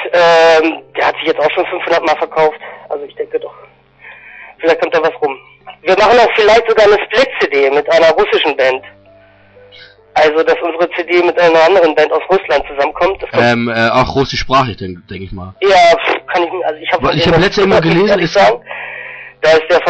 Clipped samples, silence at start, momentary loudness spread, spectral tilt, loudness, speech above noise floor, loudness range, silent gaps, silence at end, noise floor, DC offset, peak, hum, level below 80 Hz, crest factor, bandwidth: under 0.1%; 0 s; 14 LU; -5 dB/octave; -11 LUFS; 32 dB; 6 LU; none; 0 s; -44 dBFS; under 0.1%; -2 dBFS; none; -40 dBFS; 10 dB; 8.4 kHz